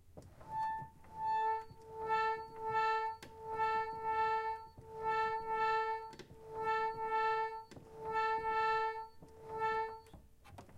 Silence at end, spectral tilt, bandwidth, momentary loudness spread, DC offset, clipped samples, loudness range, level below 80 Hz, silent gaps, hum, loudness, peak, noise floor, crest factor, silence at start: 0 s; -4 dB/octave; 12 kHz; 17 LU; under 0.1%; under 0.1%; 1 LU; -66 dBFS; none; none; -37 LUFS; -24 dBFS; -59 dBFS; 14 dB; 0.05 s